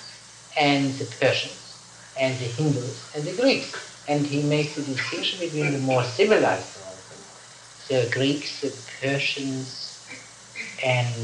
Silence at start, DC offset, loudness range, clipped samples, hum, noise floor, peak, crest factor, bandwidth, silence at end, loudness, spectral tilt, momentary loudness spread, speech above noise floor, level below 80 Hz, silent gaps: 0 s; under 0.1%; 4 LU; under 0.1%; none; -46 dBFS; -8 dBFS; 18 dB; 11 kHz; 0 s; -25 LUFS; -4.5 dB/octave; 19 LU; 22 dB; -68 dBFS; none